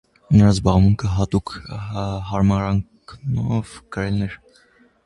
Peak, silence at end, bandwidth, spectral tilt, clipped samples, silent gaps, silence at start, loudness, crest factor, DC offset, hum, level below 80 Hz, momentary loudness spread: 0 dBFS; 0.7 s; 11 kHz; -7.5 dB/octave; under 0.1%; none; 0.3 s; -20 LUFS; 20 dB; under 0.1%; none; -34 dBFS; 16 LU